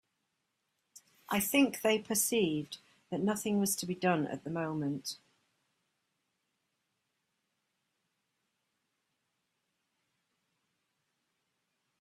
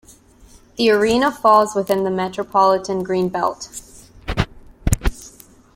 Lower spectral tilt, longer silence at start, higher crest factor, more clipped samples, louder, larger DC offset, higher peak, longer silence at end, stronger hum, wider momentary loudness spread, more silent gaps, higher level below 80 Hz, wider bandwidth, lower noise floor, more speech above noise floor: about the same, -4 dB/octave vs -5 dB/octave; first, 1.3 s vs 0.8 s; about the same, 22 dB vs 20 dB; neither; second, -32 LUFS vs -18 LUFS; neither; second, -14 dBFS vs 0 dBFS; first, 6.85 s vs 0.45 s; neither; second, 13 LU vs 18 LU; neither; second, -76 dBFS vs -32 dBFS; about the same, 16 kHz vs 16.5 kHz; first, -83 dBFS vs -48 dBFS; first, 51 dB vs 30 dB